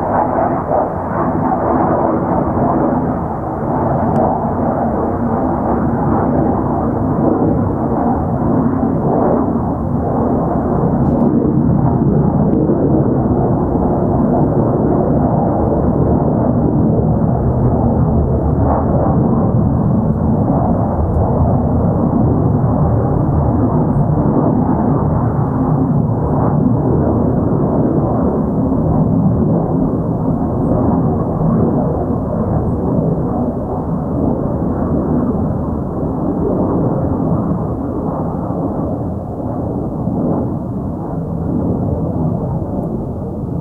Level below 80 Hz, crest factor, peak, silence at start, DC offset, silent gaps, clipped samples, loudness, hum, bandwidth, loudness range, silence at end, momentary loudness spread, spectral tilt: -26 dBFS; 14 dB; 0 dBFS; 0 s; under 0.1%; none; under 0.1%; -15 LUFS; none; 2.4 kHz; 4 LU; 0 s; 6 LU; -13 dB/octave